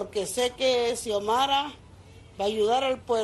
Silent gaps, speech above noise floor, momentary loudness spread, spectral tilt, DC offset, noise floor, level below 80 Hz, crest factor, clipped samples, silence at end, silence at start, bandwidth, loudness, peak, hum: none; 23 dB; 6 LU; -2.5 dB/octave; under 0.1%; -49 dBFS; -56 dBFS; 14 dB; under 0.1%; 0 s; 0 s; 12.5 kHz; -26 LUFS; -12 dBFS; none